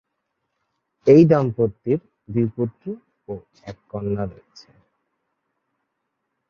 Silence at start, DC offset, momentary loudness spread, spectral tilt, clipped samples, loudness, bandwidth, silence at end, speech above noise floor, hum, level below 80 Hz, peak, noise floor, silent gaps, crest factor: 1.05 s; under 0.1%; 23 LU; -9.5 dB/octave; under 0.1%; -20 LUFS; 7 kHz; 2.15 s; 57 dB; none; -54 dBFS; -2 dBFS; -77 dBFS; none; 20 dB